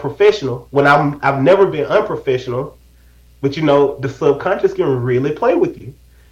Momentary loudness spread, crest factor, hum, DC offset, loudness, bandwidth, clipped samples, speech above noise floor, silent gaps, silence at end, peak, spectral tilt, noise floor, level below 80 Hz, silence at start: 10 LU; 14 dB; none; under 0.1%; -15 LUFS; 8 kHz; under 0.1%; 32 dB; none; 0.4 s; 0 dBFS; -7 dB/octave; -46 dBFS; -46 dBFS; 0 s